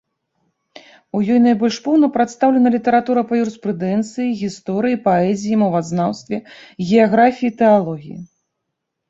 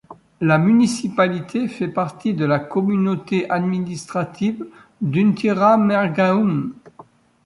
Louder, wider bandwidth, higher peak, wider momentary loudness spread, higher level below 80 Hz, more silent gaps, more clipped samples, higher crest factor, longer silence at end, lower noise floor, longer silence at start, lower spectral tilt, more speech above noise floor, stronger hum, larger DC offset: about the same, -17 LUFS vs -19 LUFS; second, 7.8 kHz vs 11.5 kHz; about the same, -2 dBFS vs -2 dBFS; first, 13 LU vs 10 LU; about the same, -58 dBFS vs -60 dBFS; neither; neither; about the same, 16 dB vs 16 dB; first, 0.85 s vs 0.45 s; first, -77 dBFS vs -47 dBFS; first, 1.15 s vs 0.1 s; about the same, -6.5 dB/octave vs -7 dB/octave; first, 61 dB vs 29 dB; neither; neither